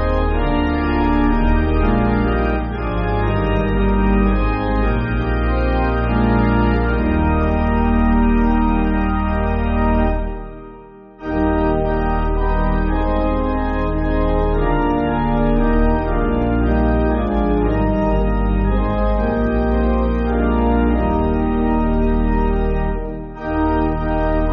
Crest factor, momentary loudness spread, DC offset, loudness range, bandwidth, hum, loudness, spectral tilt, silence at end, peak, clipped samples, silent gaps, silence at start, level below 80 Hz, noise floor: 12 dB; 4 LU; under 0.1%; 3 LU; 5.2 kHz; none; -18 LUFS; -7 dB/octave; 0 s; -4 dBFS; under 0.1%; none; 0 s; -20 dBFS; -39 dBFS